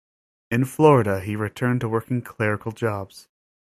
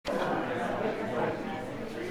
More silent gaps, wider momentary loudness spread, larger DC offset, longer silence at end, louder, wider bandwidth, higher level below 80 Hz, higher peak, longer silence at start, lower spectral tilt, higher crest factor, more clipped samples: neither; first, 12 LU vs 6 LU; neither; first, 0.4 s vs 0 s; first, -22 LUFS vs -33 LUFS; second, 15.5 kHz vs over 20 kHz; about the same, -58 dBFS vs -54 dBFS; first, -2 dBFS vs -16 dBFS; first, 0.5 s vs 0.05 s; first, -7.5 dB/octave vs -6 dB/octave; about the same, 20 dB vs 16 dB; neither